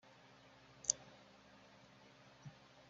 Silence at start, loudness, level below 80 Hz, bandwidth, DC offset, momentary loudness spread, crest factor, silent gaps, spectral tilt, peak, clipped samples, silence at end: 0.05 s; -40 LUFS; -80 dBFS; 7.4 kHz; under 0.1%; 24 LU; 40 dB; none; -2.5 dB/octave; -12 dBFS; under 0.1%; 0 s